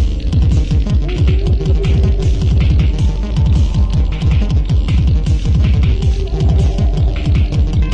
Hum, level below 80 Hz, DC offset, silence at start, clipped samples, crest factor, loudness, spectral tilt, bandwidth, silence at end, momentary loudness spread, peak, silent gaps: none; -14 dBFS; under 0.1%; 0 s; under 0.1%; 10 dB; -15 LUFS; -7.5 dB/octave; 8 kHz; 0 s; 3 LU; -2 dBFS; none